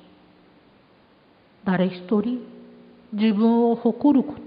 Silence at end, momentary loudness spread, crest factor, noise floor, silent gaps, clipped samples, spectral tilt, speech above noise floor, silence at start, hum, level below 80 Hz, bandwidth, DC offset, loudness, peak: 0 s; 14 LU; 16 dB; -56 dBFS; none; under 0.1%; -12 dB/octave; 36 dB; 1.65 s; none; -64 dBFS; 5 kHz; under 0.1%; -22 LUFS; -8 dBFS